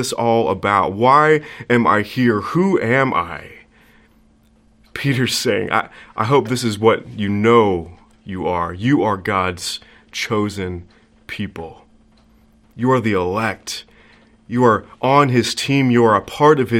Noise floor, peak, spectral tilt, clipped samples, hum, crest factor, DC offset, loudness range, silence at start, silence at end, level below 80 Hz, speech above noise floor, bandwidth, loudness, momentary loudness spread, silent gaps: -54 dBFS; 0 dBFS; -5.5 dB/octave; under 0.1%; none; 18 dB; under 0.1%; 7 LU; 0 s; 0 s; -54 dBFS; 37 dB; 16.5 kHz; -17 LUFS; 15 LU; none